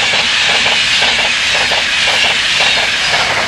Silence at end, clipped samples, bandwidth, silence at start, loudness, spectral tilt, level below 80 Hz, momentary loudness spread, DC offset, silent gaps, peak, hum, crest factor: 0 s; under 0.1%; 15.5 kHz; 0 s; -10 LUFS; 0 dB/octave; -42 dBFS; 2 LU; under 0.1%; none; 0 dBFS; none; 12 dB